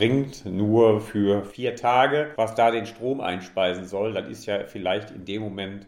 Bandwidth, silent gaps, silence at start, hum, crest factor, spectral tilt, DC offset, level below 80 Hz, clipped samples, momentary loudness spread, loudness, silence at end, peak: 16 kHz; none; 0 s; none; 18 dB; -6.5 dB/octave; under 0.1%; -58 dBFS; under 0.1%; 11 LU; -24 LUFS; 0.05 s; -6 dBFS